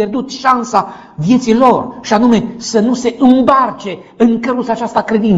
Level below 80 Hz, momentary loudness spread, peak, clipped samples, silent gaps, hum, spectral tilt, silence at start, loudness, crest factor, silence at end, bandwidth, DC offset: -46 dBFS; 8 LU; 0 dBFS; 0.5%; none; none; -6 dB/octave; 0 s; -12 LUFS; 12 dB; 0 s; 8 kHz; under 0.1%